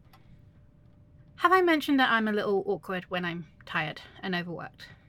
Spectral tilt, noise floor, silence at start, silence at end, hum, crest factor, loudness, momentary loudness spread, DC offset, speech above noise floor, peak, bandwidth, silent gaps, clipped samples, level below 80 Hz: -5.5 dB/octave; -56 dBFS; 1.4 s; 0.15 s; none; 20 dB; -27 LUFS; 16 LU; under 0.1%; 29 dB; -8 dBFS; 17.5 kHz; none; under 0.1%; -62 dBFS